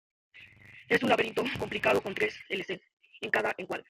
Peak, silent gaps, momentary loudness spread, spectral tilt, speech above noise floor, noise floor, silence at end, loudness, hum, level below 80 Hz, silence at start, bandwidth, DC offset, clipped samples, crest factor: -10 dBFS; 2.93-2.97 s; 13 LU; -4.5 dB/octave; 23 dB; -53 dBFS; 0.05 s; -29 LUFS; none; -64 dBFS; 0.35 s; 16 kHz; under 0.1%; under 0.1%; 22 dB